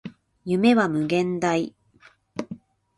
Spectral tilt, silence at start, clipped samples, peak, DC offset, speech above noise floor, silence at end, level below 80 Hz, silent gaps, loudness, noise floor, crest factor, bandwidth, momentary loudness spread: -6 dB/octave; 0.05 s; under 0.1%; -8 dBFS; under 0.1%; 35 dB; 0.4 s; -64 dBFS; none; -22 LUFS; -56 dBFS; 18 dB; 11.5 kHz; 20 LU